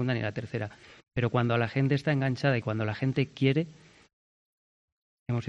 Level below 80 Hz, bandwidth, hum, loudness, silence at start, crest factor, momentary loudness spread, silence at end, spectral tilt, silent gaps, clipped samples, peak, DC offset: -62 dBFS; 7.8 kHz; none; -29 LUFS; 0 s; 18 dB; 10 LU; 0 s; -8 dB/octave; 4.13-5.26 s; under 0.1%; -12 dBFS; under 0.1%